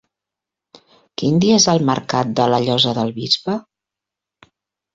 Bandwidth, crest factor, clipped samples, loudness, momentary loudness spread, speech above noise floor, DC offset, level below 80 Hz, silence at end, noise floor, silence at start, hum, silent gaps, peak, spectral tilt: 7.8 kHz; 18 dB; under 0.1%; -17 LUFS; 11 LU; 69 dB; under 0.1%; -56 dBFS; 1.35 s; -85 dBFS; 1.2 s; none; none; -2 dBFS; -4.5 dB/octave